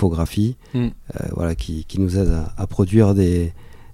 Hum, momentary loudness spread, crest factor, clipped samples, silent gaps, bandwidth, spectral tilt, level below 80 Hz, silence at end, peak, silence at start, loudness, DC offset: none; 12 LU; 16 dB; under 0.1%; none; 14.5 kHz; -8 dB/octave; -30 dBFS; 0 s; -2 dBFS; 0 s; -21 LUFS; under 0.1%